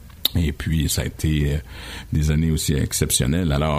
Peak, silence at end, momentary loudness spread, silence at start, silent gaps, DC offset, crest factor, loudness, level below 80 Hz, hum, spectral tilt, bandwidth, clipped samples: 0 dBFS; 0 s; 7 LU; 0 s; none; under 0.1%; 20 dB; -21 LUFS; -28 dBFS; none; -4.5 dB/octave; 16 kHz; under 0.1%